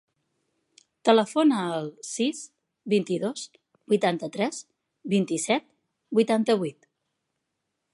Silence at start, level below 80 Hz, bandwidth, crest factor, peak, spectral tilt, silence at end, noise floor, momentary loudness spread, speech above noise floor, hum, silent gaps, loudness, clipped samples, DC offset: 1.05 s; -78 dBFS; 11.5 kHz; 22 dB; -6 dBFS; -5 dB/octave; 1.2 s; -81 dBFS; 17 LU; 56 dB; none; none; -25 LUFS; under 0.1%; under 0.1%